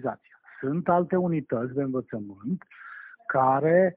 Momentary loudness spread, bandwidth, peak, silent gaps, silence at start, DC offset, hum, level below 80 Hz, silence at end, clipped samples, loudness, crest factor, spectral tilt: 19 LU; 3.6 kHz; -8 dBFS; none; 0 s; under 0.1%; none; -66 dBFS; 0.05 s; under 0.1%; -26 LUFS; 18 dB; -9 dB/octave